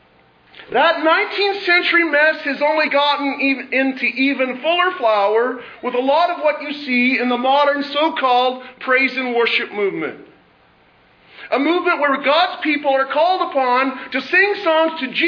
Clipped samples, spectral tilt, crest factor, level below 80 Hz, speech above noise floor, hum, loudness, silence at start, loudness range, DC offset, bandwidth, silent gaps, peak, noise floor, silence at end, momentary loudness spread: under 0.1%; -4.5 dB/octave; 16 dB; -68 dBFS; 36 dB; none; -17 LUFS; 0.55 s; 4 LU; under 0.1%; 5.4 kHz; none; -2 dBFS; -53 dBFS; 0 s; 7 LU